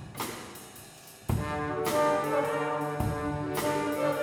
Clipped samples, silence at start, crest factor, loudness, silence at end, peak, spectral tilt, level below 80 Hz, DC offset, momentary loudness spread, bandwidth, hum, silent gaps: under 0.1%; 0 s; 16 dB; -30 LUFS; 0 s; -16 dBFS; -5.5 dB/octave; -50 dBFS; under 0.1%; 17 LU; over 20 kHz; none; none